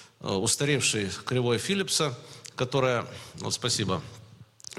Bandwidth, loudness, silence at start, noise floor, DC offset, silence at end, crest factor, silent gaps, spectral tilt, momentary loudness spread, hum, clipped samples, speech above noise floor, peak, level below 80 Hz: 15.5 kHz; -27 LUFS; 0 s; -48 dBFS; under 0.1%; 0 s; 16 dB; none; -3.5 dB/octave; 16 LU; none; under 0.1%; 20 dB; -12 dBFS; -62 dBFS